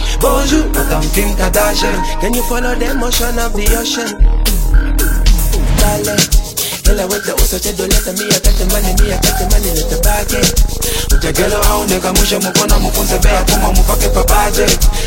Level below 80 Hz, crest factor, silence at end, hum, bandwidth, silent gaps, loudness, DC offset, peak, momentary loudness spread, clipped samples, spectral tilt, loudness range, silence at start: -14 dBFS; 12 dB; 0 s; none; 17 kHz; none; -13 LUFS; under 0.1%; 0 dBFS; 4 LU; under 0.1%; -3.5 dB/octave; 3 LU; 0 s